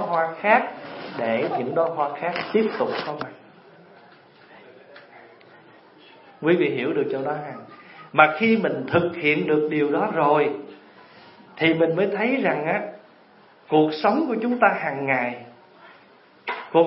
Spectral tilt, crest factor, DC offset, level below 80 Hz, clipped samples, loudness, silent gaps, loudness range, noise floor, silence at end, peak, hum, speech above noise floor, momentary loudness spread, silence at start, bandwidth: -10.5 dB/octave; 22 dB; under 0.1%; -74 dBFS; under 0.1%; -22 LUFS; none; 8 LU; -53 dBFS; 0 s; 0 dBFS; none; 31 dB; 15 LU; 0 s; 5.8 kHz